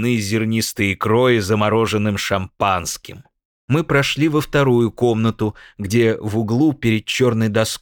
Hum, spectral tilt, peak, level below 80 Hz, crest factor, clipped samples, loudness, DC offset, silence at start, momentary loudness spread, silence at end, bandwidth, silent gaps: none; -5.5 dB/octave; -2 dBFS; -48 dBFS; 16 dB; under 0.1%; -18 LUFS; under 0.1%; 0 s; 6 LU; 0.05 s; 18.5 kHz; 3.45-3.68 s